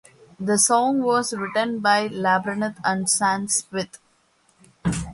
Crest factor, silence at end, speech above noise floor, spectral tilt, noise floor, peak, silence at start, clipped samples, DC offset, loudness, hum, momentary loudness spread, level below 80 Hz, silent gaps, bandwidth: 18 dB; 0 s; 41 dB; -3 dB/octave; -62 dBFS; -6 dBFS; 0.4 s; under 0.1%; under 0.1%; -21 LUFS; none; 12 LU; -50 dBFS; none; 11.5 kHz